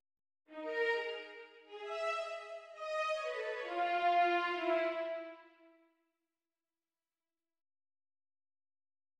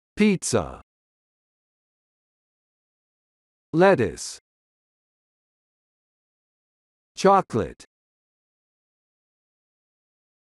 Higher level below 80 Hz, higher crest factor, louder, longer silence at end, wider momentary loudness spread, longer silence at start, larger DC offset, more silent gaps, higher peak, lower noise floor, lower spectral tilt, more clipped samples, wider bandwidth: second, -88 dBFS vs -56 dBFS; about the same, 18 dB vs 22 dB; second, -36 LUFS vs -21 LUFS; first, 3.7 s vs 2.7 s; about the same, 18 LU vs 18 LU; first, 0.5 s vs 0.15 s; neither; second, none vs 0.83-3.73 s, 4.41-7.15 s; second, -22 dBFS vs -6 dBFS; about the same, under -90 dBFS vs under -90 dBFS; second, -1.5 dB/octave vs -5 dB/octave; neither; second, 9.8 kHz vs 12 kHz